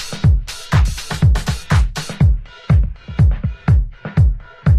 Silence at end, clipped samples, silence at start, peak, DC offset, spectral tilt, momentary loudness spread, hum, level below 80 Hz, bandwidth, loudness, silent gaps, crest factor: 0 s; under 0.1%; 0 s; -2 dBFS; under 0.1%; -6 dB/octave; 5 LU; none; -18 dBFS; 14 kHz; -17 LUFS; none; 12 dB